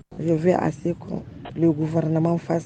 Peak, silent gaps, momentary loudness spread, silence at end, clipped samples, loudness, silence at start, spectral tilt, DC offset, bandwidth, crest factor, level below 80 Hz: -6 dBFS; none; 13 LU; 0 s; under 0.1%; -23 LUFS; 0.1 s; -9 dB/octave; under 0.1%; 8.6 kHz; 16 dB; -52 dBFS